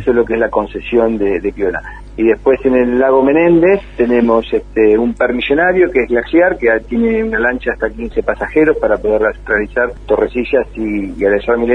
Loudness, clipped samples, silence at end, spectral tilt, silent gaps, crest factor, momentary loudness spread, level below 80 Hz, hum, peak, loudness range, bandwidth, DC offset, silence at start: -13 LUFS; under 0.1%; 0 s; -8 dB/octave; none; 12 dB; 7 LU; -34 dBFS; none; 0 dBFS; 3 LU; 5.6 kHz; under 0.1%; 0 s